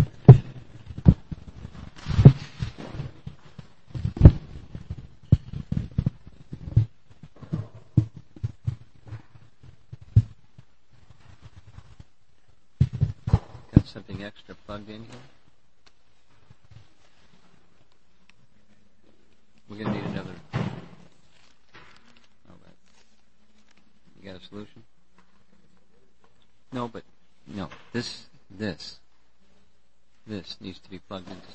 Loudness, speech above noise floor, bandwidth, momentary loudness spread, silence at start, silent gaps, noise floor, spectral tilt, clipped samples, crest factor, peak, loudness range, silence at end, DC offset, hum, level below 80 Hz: -24 LUFS; 30 dB; 8 kHz; 27 LU; 0 s; none; -68 dBFS; -9 dB/octave; under 0.1%; 26 dB; 0 dBFS; 24 LU; 0.2 s; 0.4%; none; -36 dBFS